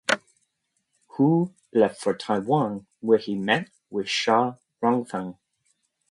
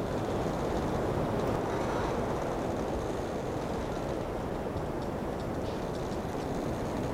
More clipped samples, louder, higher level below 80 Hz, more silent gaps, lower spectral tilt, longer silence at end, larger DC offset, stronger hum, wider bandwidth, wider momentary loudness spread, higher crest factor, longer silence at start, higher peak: neither; first, -25 LUFS vs -33 LUFS; second, -70 dBFS vs -44 dBFS; neither; about the same, -5.5 dB/octave vs -6.5 dB/octave; first, 0.8 s vs 0 s; neither; neither; second, 11.5 kHz vs 17 kHz; first, 11 LU vs 4 LU; first, 20 dB vs 14 dB; about the same, 0.1 s vs 0 s; first, -6 dBFS vs -18 dBFS